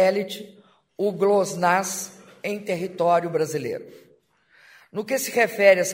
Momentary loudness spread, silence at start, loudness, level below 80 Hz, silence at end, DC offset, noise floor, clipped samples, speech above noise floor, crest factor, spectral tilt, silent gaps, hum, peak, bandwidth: 15 LU; 0 s; -23 LUFS; -72 dBFS; 0 s; under 0.1%; -60 dBFS; under 0.1%; 37 dB; 20 dB; -4 dB/octave; none; none; -2 dBFS; 16 kHz